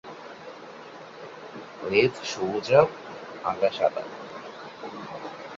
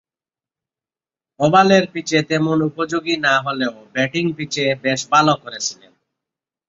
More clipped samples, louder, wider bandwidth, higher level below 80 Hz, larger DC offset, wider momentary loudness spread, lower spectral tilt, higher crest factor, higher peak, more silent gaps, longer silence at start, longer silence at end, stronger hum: neither; second, -25 LUFS vs -18 LUFS; about the same, 7.8 kHz vs 7.8 kHz; about the same, -64 dBFS vs -60 dBFS; neither; first, 21 LU vs 9 LU; about the same, -5 dB/octave vs -4.5 dB/octave; first, 24 dB vs 18 dB; about the same, -4 dBFS vs -2 dBFS; neither; second, 0.05 s vs 1.4 s; second, 0 s vs 0.95 s; neither